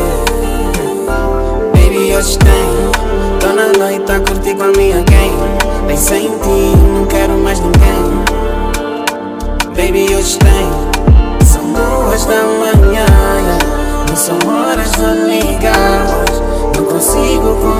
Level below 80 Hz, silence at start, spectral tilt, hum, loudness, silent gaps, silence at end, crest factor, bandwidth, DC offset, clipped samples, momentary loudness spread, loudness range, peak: -14 dBFS; 0 s; -5 dB/octave; none; -11 LUFS; none; 0 s; 10 dB; 16.5 kHz; under 0.1%; 2%; 7 LU; 2 LU; 0 dBFS